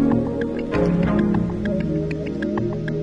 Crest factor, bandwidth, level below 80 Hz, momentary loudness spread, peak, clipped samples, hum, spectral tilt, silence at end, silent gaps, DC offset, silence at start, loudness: 14 dB; 7.6 kHz; -38 dBFS; 6 LU; -8 dBFS; under 0.1%; none; -9 dB/octave; 0 s; none; under 0.1%; 0 s; -22 LUFS